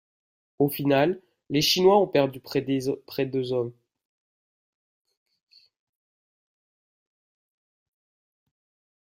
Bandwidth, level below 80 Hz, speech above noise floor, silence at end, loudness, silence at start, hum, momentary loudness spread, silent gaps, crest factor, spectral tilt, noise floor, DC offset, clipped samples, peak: 16 kHz; -66 dBFS; over 67 dB; 5.35 s; -24 LUFS; 0.6 s; none; 11 LU; none; 22 dB; -5 dB/octave; under -90 dBFS; under 0.1%; under 0.1%; -6 dBFS